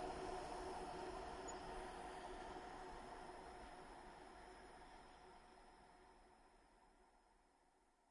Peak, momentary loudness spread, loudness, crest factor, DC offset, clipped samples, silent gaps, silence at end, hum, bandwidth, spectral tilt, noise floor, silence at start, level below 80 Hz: -38 dBFS; 16 LU; -54 LUFS; 16 dB; under 0.1%; under 0.1%; none; 0 s; none; 11.5 kHz; -4 dB/octave; -77 dBFS; 0 s; -66 dBFS